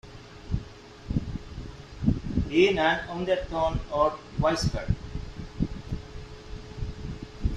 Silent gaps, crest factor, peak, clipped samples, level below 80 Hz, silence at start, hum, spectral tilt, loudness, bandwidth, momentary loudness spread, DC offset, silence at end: none; 20 dB; -8 dBFS; under 0.1%; -38 dBFS; 0.05 s; none; -6 dB/octave; -29 LUFS; 12 kHz; 19 LU; under 0.1%; 0 s